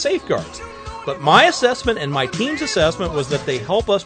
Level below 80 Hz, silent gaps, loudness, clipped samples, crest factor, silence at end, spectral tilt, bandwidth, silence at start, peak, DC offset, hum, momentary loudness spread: -40 dBFS; none; -18 LUFS; under 0.1%; 18 dB; 0 s; -4 dB/octave; 9.6 kHz; 0 s; 0 dBFS; under 0.1%; none; 16 LU